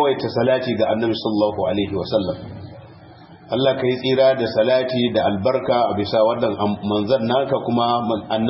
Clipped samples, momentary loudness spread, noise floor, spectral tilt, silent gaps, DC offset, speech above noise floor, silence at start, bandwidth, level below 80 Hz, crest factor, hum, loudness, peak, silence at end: under 0.1%; 5 LU; -43 dBFS; -10.5 dB/octave; none; under 0.1%; 24 dB; 0 s; 5.8 kHz; -54 dBFS; 14 dB; none; -19 LUFS; -4 dBFS; 0 s